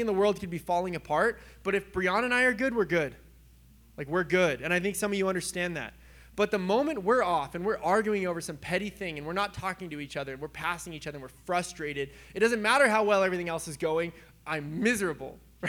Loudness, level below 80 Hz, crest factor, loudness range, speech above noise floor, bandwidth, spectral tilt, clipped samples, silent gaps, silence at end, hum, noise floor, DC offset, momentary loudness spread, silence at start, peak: -29 LUFS; -56 dBFS; 20 dB; 6 LU; 27 dB; over 20 kHz; -4.5 dB/octave; under 0.1%; none; 0 s; none; -56 dBFS; under 0.1%; 13 LU; 0 s; -10 dBFS